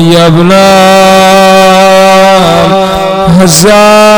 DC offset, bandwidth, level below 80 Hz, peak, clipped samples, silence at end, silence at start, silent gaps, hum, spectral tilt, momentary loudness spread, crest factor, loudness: under 0.1%; over 20 kHz; -30 dBFS; 0 dBFS; 6%; 0 s; 0 s; none; none; -4.5 dB/octave; 4 LU; 2 dB; -3 LUFS